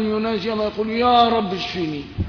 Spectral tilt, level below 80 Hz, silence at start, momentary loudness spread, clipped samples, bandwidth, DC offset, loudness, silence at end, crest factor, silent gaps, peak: -6.5 dB/octave; -42 dBFS; 0 s; 9 LU; under 0.1%; 5.4 kHz; under 0.1%; -20 LUFS; 0 s; 16 dB; none; -4 dBFS